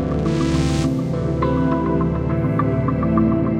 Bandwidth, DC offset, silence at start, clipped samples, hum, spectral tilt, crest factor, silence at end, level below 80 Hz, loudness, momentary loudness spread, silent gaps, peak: 11 kHz; under 0.1%; 0 s; under 0.1%; none; -8 dB/octave; 14 dB; 0 s; -30 dBFS; -19 LUFS; 3 LU; none; -4 dBFS